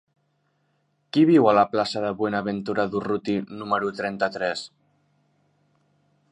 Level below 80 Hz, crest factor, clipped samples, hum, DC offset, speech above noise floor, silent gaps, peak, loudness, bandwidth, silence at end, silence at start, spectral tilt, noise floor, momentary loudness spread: -64 dBFS; 20 dB; under 0.1%; none; under 0.1%; 47 dB; none; -4 dBFS; -23 LUFS; 10 kHz; 1.65 s; 1.15 s; -6.5 dB/octave; -70 dBFS; 11 LU